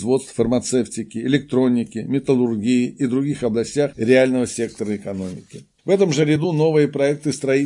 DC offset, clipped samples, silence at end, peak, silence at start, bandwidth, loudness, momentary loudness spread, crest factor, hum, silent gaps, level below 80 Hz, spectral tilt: under 0.1%; under 0.1%; 0 s; -2 dBFS; 0 s; 11.5 kHz; -20 LUFS; 10 LU; 18 dB; none; none; -54 dBFS; -6 dB/octave